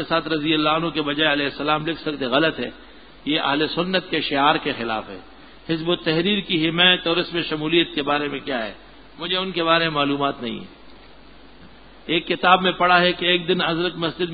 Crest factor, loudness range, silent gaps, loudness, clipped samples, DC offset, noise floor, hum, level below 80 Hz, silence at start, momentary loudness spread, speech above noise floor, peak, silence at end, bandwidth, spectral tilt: 20 dB; 4 LU; none; -20 LUFS; under 0.1%; 0.4%; -47 dBFS; none; -52 dBFS; 0 s; 12 LU; 26 dB; 0 dBFS; 0 s; 5 kHz; -9.5 dB/octave